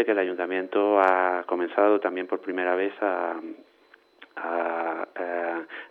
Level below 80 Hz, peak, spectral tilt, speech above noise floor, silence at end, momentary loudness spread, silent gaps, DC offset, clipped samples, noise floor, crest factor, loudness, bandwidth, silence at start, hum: -86 dBFS; -6 dBFS; -6.5 dB/octave; 33 dB; 0.05 s; 11 LU; none; under 0.1%; under 0.1%; -58 dBFS; 20 dB; -26 LUFS; 5.4 kHz; 0 s; none